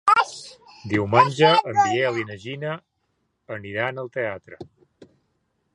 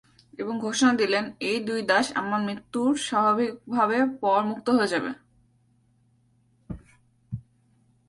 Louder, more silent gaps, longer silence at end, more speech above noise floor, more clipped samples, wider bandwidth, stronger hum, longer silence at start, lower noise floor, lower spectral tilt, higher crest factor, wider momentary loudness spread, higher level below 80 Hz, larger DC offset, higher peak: first, -22 LUFS vs -25 LUFS; neither; first, 1.1 s vs 0.7 s; first, 50 dB vs 40 dB; neither; about the same, 11 kHz vs 11.5 kHz; neither; second, 0.05 s vs 0.4 s; first, -73 dBFS vs -64 dBFS; about the same, -5 dB/octave vs -4 dB/octave; about the same, 22 dB vs 20 dB; first, 22 LU vs 18 LU; about the same, -60 dBFS vs -60 dBFS; neither; first, -2 dBFS vs -8 dBFS